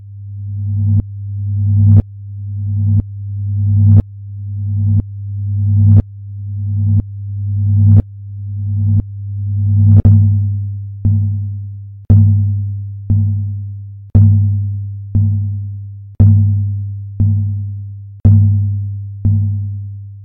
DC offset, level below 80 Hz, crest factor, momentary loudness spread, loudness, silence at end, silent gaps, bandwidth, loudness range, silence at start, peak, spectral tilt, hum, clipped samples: 0.1%; -32 dBFS; 14 dB; 17 LU; -14 LUFS; 0 s; none; 1 kHz; 3 LU; 0 s; 0 dBFS; -14.5 dB/octave; none; under 0.1%